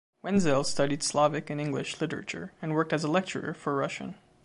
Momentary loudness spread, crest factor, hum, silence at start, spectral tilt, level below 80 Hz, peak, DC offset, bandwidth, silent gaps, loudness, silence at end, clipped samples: 10 LU; 18 dB; none; 0.25 s; -5 dB/octave; -64 dBFS; -12 dBFS; under 0.1%; 11.5 kHz; none; -29 LUFS; 0.3 s; under 0.1%